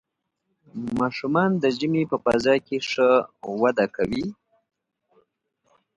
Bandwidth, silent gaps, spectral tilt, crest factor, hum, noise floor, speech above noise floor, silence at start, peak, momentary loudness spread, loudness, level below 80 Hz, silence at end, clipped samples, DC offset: 11 kHz; none; -6 dB/octave; 18 dB; none; -77 dBFS; 55 dB; 0.75 s; -6 dBFS; 11 LU; -23 LUFS; -58 dBFS; 1.65 s; under 0.1%; under 0.1%